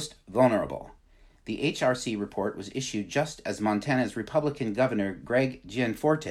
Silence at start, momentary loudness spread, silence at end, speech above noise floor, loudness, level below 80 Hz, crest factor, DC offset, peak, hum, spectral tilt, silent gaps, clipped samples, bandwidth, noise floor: 0 s; 8 LU; 0 s; 30 dB; -28 LUFS; -56 dBFS; 20 dB; under 0.1%; -8 dBFS; none; -5.5 dB/octave; none; under 0.1%; 15 kHz; -58 dBFS